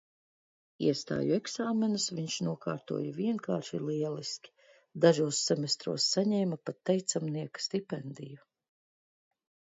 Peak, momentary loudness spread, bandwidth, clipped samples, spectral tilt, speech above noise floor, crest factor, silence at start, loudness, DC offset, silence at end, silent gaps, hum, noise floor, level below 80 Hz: -10 dBFS; 12 LU; 7.8 kHz; under 0.1%; -4.5 dB/octave; over 58 dB; 24 dB; 0.8 s; -32 LUFS; under 0.1%; 1.35 s; none; none; under -90 dBFS; -76 dBFS